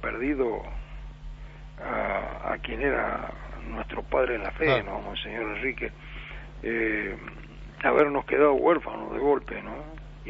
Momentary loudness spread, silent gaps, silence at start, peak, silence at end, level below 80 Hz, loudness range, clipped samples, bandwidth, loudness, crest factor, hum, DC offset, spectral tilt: 20 LU; none; 0 s; -6 dBFS; 0 s; -42 dBFS; 6 LU; under 0.1%; 6.8 kHz; -27 LUFS; 22 dB; 50 Hz at -50 dBFS; under 0.1%; -3.5 dB/octave